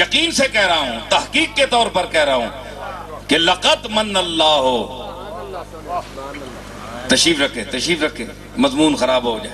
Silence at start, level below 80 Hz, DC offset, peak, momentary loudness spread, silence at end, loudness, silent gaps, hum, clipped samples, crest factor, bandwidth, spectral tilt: 0 s; -42 dBFS; under 0.1%; 0 dBFS; 17 LU; 0 s; -16 LUFS; none; 50 Hz at -40 dBFS; under 0.1%; 18 dB; 13.5 kHz; -2.5 dB/octave